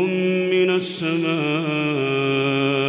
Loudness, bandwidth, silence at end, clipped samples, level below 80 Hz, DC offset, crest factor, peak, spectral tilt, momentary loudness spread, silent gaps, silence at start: -20 LUFS; 4 kHz; 0 s; under 0.1%; -68 dBFS; under 0.1%; 12 dB; -10 dBFS; -10.5 dB/octave; 3 LU; none; 0 s